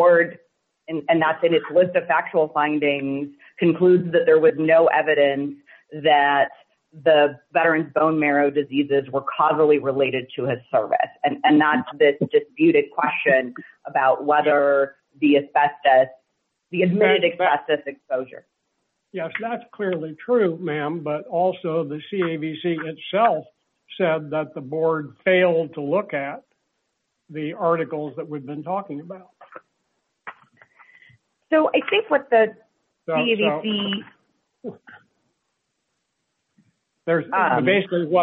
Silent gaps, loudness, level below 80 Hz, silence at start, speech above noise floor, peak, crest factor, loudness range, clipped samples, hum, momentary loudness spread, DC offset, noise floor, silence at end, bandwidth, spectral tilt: none; -20 LUFS; -72 dBFS; 0 s; 55 dB; -4 dBFS; 16 dB; 10 LU; under 0.1%; none; 14 LU; under 0.1%; -75 dBFS; 0 s; 4.2 kHz; -9 dB/octave